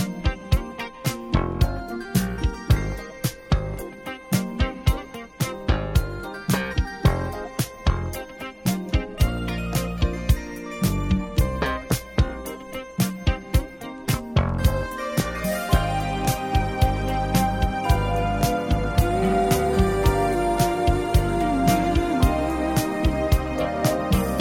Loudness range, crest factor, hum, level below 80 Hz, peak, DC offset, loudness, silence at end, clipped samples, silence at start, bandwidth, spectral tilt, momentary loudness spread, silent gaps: 5 LU; 18 dB; none; -28 dBFS; -4 dBFS; under 0.1%; -24 LUFS; 0 s; under 0.1%; 0 s; 17 kHz; -6 dB/octave; 8 LU; none